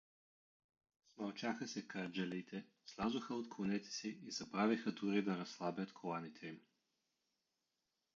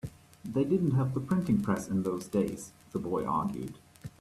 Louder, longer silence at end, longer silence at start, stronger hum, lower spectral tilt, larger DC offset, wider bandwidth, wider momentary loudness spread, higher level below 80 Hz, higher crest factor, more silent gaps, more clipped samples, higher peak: second, -43 LUFS vs -31 LUFS; first, 1.55 s vs 0.1 s; first, 1.15 s vs 0.05 s; neither; second, -4.5 dB/octave vs -8 dB/octave; neither; second, 7.2 kHz vs 14 kHz; second, 13 LU vs 16 LU; second, -80 dBFS vs -60 dBFS; about the same, 20 dB vs 16 dB; neither; neither; second, -24 dBFS vs -16 dBFS